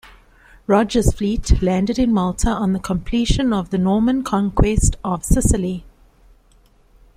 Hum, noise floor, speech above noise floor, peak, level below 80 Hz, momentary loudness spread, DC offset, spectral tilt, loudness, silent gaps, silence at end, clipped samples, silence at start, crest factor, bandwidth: none; -53 dBFS; 36 dB; -2 dBFS; -26 dBFS; 5 LU; under 0.1%; -6 dB/octave; -19 LUFS; none; 1.3 s; under 0.1%; 0.7 s; 16 dB; 15.5 kHz